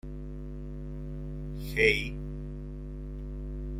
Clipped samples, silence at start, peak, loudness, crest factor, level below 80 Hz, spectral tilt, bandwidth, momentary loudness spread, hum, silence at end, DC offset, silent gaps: under 0.1%; 0.05 s; -8 dBFS; -33 LUFS; 26 dB; -40 dBFS; -5.5 dB/octave; 15.5 kHz; 17 LU; 50 Hz at -40 dBFS; 0 s; under 0.1%; none